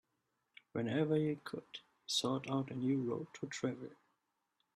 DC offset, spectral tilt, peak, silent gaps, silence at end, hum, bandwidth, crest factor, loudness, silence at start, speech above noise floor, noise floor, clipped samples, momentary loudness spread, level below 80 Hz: under 0.1%; -5 dB/octave; -24 dBFS; none; 0.8 s; none; 13 kHz; 16 dB; -38 LUFS; 0.75 s; 46 dB; -84 dBFS; under 0.1%; 14 LU; -80 dBFS